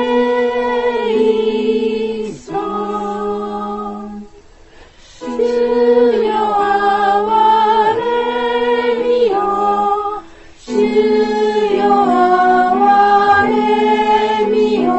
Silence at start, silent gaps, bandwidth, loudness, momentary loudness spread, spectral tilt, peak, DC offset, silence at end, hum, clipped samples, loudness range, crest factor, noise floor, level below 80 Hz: 0 s; none; 8.4 kHz; -14 LUFS; 11 LU; -5.5 dB/octave; -2 dBFS; under 0.1%; 0 s; none; under 0.1%; 9 LU; 12 dB; -41 dBFS; -46 dBFS